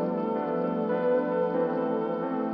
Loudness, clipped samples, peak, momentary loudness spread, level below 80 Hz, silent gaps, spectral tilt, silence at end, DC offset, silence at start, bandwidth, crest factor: -28 LUFS; under 0.1%; -14 dBFS; 3 LU; -70 dBFS; none; -10 dB/octave; 0 s; under 0.1%; 0 s; 5.2 kHz; 12 dB